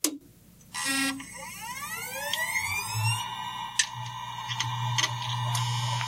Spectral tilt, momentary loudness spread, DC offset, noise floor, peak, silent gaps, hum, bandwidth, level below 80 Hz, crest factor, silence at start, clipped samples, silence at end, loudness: -2.5 dB/octave; 10 LU; under 0.1%; -54 dBFS; -6 dBFS; none; 60 Hz at -50 dBFS; 16 kHz; -62 dBFS; 26 dB; 0.05 s; under 0.1%; 0 s; -30 LUFS